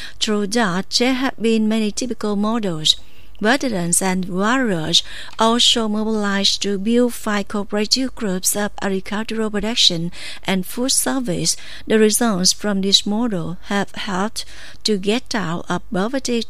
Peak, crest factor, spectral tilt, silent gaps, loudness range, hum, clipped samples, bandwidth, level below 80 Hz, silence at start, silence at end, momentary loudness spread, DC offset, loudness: 0 dBFS; 20 dB; -3 dB/octave; none; 3 LU; none; under 0.1%; 15.5 kHz; -46 dBFS; 0 s; 0.05 s; 9 LU; 4%; -18 LUFS